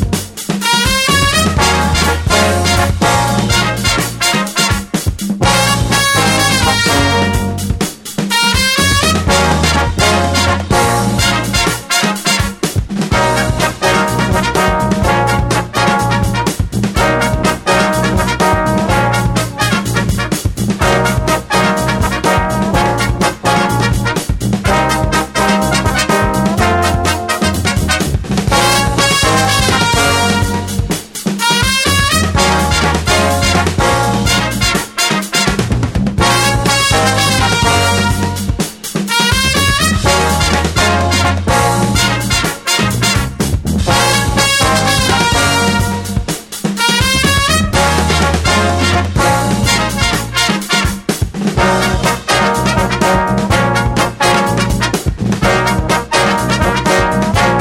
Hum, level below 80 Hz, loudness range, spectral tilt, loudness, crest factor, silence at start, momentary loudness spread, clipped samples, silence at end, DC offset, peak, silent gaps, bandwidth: none; -24 dBFS; 2 LU; -4 dB/octave; -12 LUFS; 12 dB; 0 s; 6 LU; under 0.1%; 0 s; under 0.1%; 0 dBFS; none; 17.5 kHz